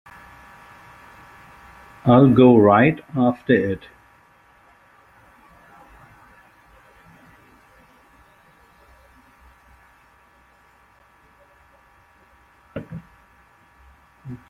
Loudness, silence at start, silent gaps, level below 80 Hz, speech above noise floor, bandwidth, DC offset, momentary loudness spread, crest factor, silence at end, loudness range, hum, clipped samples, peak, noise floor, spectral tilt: -16 LUFS; 2.05 s; none; -56 dBFS; 40 dB; 4.2 kHz; under 0.1%; 27 LU; 22 dB; 0.15 s; 26 LU; none; under 0.1%; -2 dBFS; -55 dBFS; -9.5 dB/octave